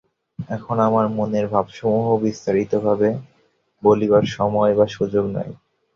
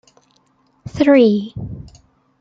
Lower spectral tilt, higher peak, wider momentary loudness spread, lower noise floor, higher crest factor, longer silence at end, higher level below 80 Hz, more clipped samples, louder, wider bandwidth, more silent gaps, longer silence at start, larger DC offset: about the same, -7.5 dB/octave vs -7.5 dB/octave; about the same, -2 dBFS vs -2 dBFS; second, 12 LU vs 24 LU; about the same, -62 dBFS vs -59 dBFS; about the same, 18 dB vs 16 dB; second, 0.4 s vs 0.6 s; second, -54 dBFS vs -48 dBFS; neither; second, -20 LUFS vs -14 LUFS; about the same, 7.2 kHz vs 7.6 kHz; neither; second, 0.4 s vs 0.85 s; neither